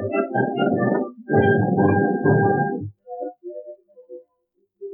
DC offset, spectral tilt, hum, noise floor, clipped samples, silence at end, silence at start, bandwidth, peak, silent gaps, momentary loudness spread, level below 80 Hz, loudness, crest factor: under 0.1%; -12.5 dB/octave; none; -70 dBFS; under 0.1%; 0 s; 0 s; 3.4 kHz; -4 dBFS; none; 18 LU; -58 dBFS; -20 LUFS; 16 dB